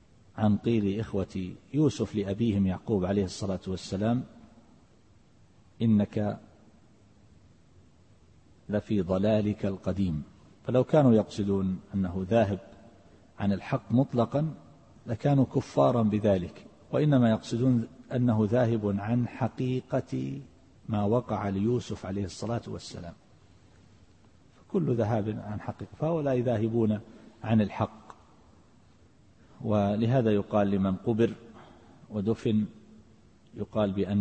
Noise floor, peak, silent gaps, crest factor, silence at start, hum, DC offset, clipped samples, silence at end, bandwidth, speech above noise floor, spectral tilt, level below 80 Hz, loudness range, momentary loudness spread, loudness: -60 dBFS; -10 dBFS; none; 18 dB; 0.35 s; none; under 0.1%; under 0.1%; 0 s; 8.6 kHz; 33 dB; -8 dB/octave; -58 dBFS; 7 LU; 12 LU; -28 LUFS